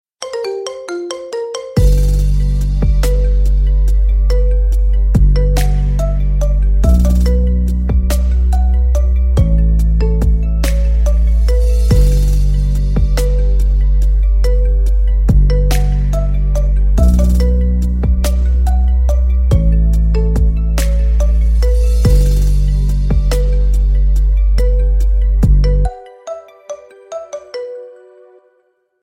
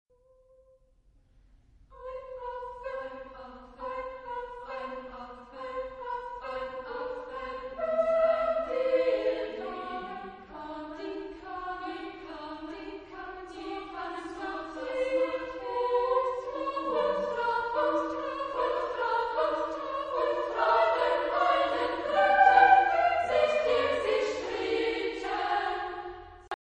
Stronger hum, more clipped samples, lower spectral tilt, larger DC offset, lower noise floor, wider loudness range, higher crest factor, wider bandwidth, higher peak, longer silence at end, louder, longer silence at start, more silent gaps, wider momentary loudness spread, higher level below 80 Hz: neither; neither; first, -7 dB/octave vs -4 dB/octave; neither; second, -59 dBFS vs -63 dBFS; second, 2 LU vs 16 LU; second, 10 dB vs 24 dB; first, 13 kHz vs 9.2 kHz; first, 0 dBFS vs -8 dBFS; first, 1.1 s vs 0.05 s; first, -15 LUFS vs -29 LUFS; second, 0.2 s vs 1.9 s; neither; second, 10 LU vs 16 LU; first, -12 dBFS vs -58 dBFS